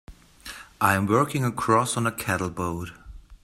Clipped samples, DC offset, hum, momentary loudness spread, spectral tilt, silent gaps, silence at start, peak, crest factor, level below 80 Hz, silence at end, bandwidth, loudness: under 0.1%; under 0.1%; none; 19 LU; -5 dB/octave; none; 0.1 s; -4 dBFS; 22 dB; -50 dBFS; 0.1 s; 16 kHz; -24 LUFS